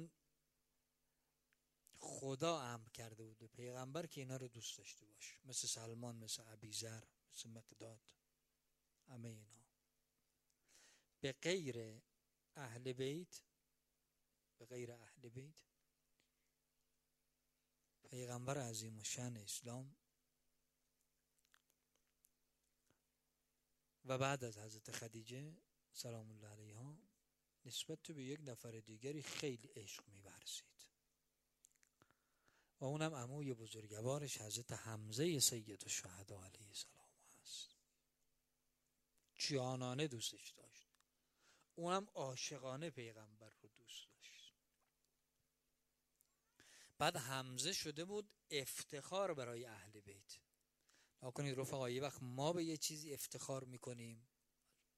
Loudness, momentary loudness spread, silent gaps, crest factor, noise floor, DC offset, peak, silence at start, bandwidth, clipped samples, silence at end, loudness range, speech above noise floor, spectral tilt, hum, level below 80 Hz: -47 LUFS; 19 LU; none; 28 dB; -87 dBFS; under 0.1%; -22 dBFS; 0 s; 15.5 kHz; under 0.1%; 0.7 s; 15 LU; 39 dB; -3.5 dB/octave; none; -86 dBFS